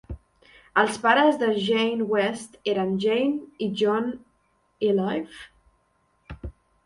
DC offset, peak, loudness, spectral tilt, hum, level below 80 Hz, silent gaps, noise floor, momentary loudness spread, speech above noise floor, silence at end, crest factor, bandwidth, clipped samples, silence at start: under 0.1%; -6 dBFS; -24 LUFS; -5 dB/octave; none; -50 dBFS; none; -68 dBFS; 21 LU; 44 dB; 0.35 s; 20 dB; 11.5 kHz; under 0.1%; 0.1 s